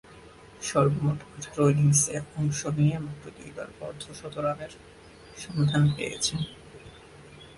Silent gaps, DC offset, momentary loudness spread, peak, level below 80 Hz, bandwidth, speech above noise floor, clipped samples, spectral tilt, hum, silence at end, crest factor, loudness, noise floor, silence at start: none; under 0.1%; 20 LU; -10 dBFS; -54 dBFS; 11.5 kHz; 23 dB; under 0.1%; -5 dB/octave; none; 0.05 s; 18 dB; -27 LUFS; -50 dBFS; 0.1 s